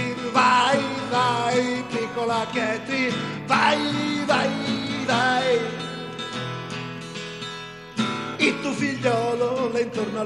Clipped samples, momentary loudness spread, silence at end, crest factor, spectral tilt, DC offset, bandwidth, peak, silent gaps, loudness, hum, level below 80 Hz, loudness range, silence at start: under 0.1%; 13 LU; 0 s; 18 dB; -4.5 dB/octave; under 0.1%; 11.5 kHz; -4 dBFS; none; -23 LUFS; none; -60 dBFS; 5 LU; 0 s